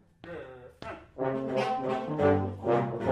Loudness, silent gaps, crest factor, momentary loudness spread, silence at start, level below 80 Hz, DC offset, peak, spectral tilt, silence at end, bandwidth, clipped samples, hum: -29 LUFS; none; 18 dB; 18 LU; 0.25 s; -62 dBFS; under 0.1%; -14 dBFS; -8 dB/octave; 0 s; 11 kHz; under 0.1%; none